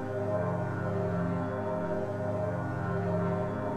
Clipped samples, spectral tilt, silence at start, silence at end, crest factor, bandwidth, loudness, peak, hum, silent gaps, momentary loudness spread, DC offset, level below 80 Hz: under 0.1%; -9 dB/octave; 0 s; 0 s; 12 dB; 8.8 kHz; -32 LUFS; -20 dBFS; none; none; 2 LU; 0.2%; -56 dBFS